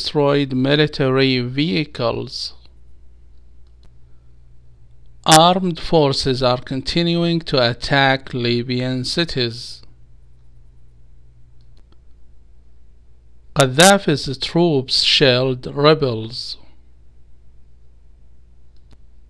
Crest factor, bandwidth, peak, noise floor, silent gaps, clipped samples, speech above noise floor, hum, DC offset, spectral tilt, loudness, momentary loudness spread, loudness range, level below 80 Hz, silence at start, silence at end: 20 dB; 11 kHz; 0 dBFS; -47 dBFS; none; under 0.1%; 30 dB; 60 Hz at -45 dBFS; 0.7%; -4.5 dB/octave; -17 LUFS; 14 LU; 12 LU; -42 dBFS; 0 s; 1.75 s